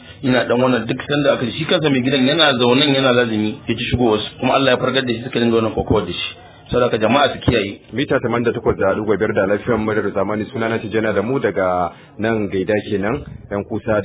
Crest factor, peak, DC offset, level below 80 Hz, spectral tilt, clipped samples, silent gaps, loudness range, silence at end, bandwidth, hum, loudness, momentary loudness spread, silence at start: 16 dB; 0 dBFS; under 0.1%; -40 dBFS; -10 dB/octave; under 0.1%; none; 4 LU; 0 s; 4 kHz; none; -18 LUFS; 9 LU; 0 s